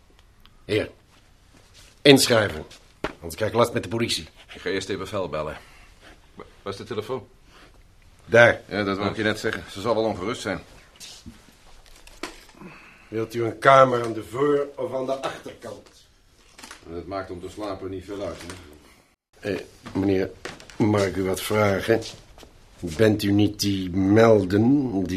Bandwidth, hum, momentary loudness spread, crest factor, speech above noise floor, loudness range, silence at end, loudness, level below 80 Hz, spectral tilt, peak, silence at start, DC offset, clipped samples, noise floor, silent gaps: 15.5 kHz; none; 22 LU; 24 dB; 33 dB; 12 LU; 0 s; -23 LUFS; -52 dBFS; -5 dB/octave; 0 dBFS; 0.7 s; under 0.1%; under 0.1%; -56 dBFS; none